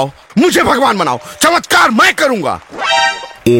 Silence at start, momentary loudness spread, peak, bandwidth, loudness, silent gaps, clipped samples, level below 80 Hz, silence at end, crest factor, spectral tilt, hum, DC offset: 0 s; 8 LU; 0 dBFS; 17 kHz; -11 LUFS; none; under 0.1%; -44 dBFS; 0 s; 12 dB; -3.5 dB/octave; none; under 0.1%